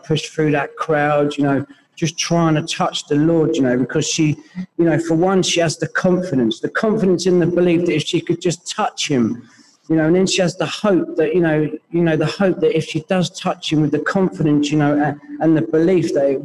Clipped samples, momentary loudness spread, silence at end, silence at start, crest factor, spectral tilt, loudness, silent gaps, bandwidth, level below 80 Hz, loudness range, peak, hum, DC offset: under 0.1%; 6 LU; 0 s; 0.05 s; 14 dB; -5.5 dB/octave; -17 LUFS; none; 12 kHz; -56 dBFS; 1 LU; -4 dBFS; none; 0.1%